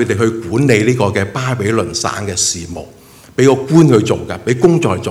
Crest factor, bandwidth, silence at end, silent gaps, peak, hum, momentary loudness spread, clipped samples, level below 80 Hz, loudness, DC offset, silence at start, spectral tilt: 14 dB; 14.5 kHz; 0 s; none; 0 dBFS; none; 8 LU; 0.2%; -44 dBFS; -13 LUFS; under 0.1%; 0 s; -5 dB/octave